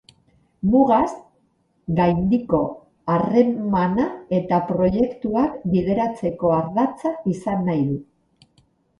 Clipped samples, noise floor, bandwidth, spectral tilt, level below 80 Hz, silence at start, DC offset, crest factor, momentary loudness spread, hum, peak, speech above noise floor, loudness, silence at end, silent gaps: under 0.1%; -64 dBFS; 9.6 kHz; -9 dB/octave; -48 dBFS; 0.65 s; under 0.1%; 18 dB; 8 LU; none; -4 dBFS; 45 dB; -21 LUFS; 0.95 s; none